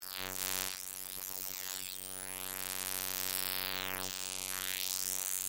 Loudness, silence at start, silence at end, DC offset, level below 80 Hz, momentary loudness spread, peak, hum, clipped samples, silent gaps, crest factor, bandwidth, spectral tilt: -36 LUFS; 0 s; 0 s; under 0.1%; -78 dBFS; 6 LU; -12 dBFS; none; under 0.1%; none; 28 dB; 17 kHz; 0 dB/octave